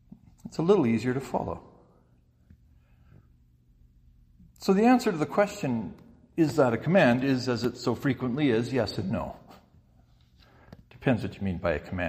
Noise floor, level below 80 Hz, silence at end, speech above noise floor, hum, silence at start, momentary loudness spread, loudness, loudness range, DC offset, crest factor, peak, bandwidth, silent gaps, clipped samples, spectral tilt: -62 dBFS; -54 dBFS; 0 s; 36 dB; none; 0.45 s; 13 LU; -27 LUFS; 8 LU; under 0.1%; 20 dB; -10 dBFS; 15.5 kHz; none; under 0.1%; -7 dB/octave